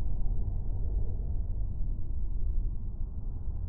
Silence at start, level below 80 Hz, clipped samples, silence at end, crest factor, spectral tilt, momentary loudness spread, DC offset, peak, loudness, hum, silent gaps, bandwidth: 0 s; -32 dBFS; under 0.1%; 0 s; 12 dB; -14 dB/octave; 5 LU; under 0.1%; -16 dBFS; -37 LUFS; none; none; 1.1 kHz